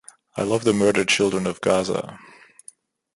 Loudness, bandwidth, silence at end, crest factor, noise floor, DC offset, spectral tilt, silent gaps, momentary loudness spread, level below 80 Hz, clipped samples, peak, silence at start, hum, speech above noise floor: -21 LUFS; 11.5 kHz; 1 s; 20 dB; -51 dBFS; under 0.1%; -4 dB/octave; none; 10 LU; -56 dBFS; under 0.1%; -4 dBFS; 0.35 s; none; 30 dB